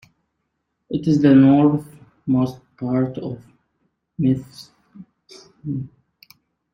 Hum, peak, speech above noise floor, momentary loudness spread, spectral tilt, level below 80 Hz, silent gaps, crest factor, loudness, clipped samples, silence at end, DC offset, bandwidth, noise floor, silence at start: none; -2 dBFS; 56 dB; 23 LU; -9 dB/octave; -56 dBFS; none; 18 dB; -19 LUFS; under 0.1%; 0.9 s; under 0.1%; 6.8 kHz; -75 dBFS; 0.9 s